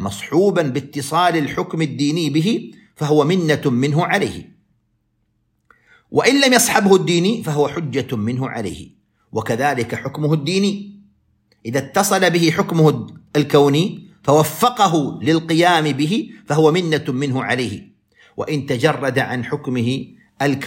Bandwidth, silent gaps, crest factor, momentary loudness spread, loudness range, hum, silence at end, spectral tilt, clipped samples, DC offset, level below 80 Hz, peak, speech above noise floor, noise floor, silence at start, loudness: 16.5 kHz; none; 18 dB; 11 LU; 5 LU; none; 0 s; -5 dB/octave; under 0.1%; under 0.1%; -56 dBFS; 0 dBFS; 49 dB; -66 dBFS; 0 s; -18 LUFS